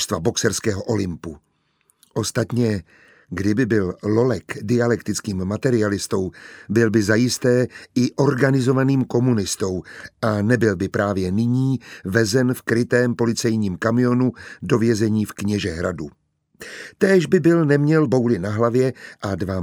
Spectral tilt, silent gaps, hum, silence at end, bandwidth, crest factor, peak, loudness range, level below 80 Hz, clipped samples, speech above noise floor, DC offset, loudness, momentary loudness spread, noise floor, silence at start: -6 dB/octave; none; none; 0 s; 18 kHz; 18 dB; -2 dBFS; 4 LU; -52 dBFS; under 0.1%; 45 dB; under 0.1%; -20 LUFS; 10 LU; -65 dBFS; 0 s